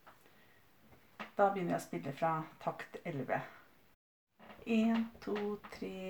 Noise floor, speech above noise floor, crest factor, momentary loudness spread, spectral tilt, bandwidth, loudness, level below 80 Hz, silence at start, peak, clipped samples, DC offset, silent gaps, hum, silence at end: -66 dBFS; 30 dB; 22 dB; 13 LU; -6.5 dB/octave; over 20 kHz; -37 LUFS; -74 dBFS; 0.05 s; -16 dBFS; under 0.1%; under 0.1%; 3.94-4.27 s; none; 0 s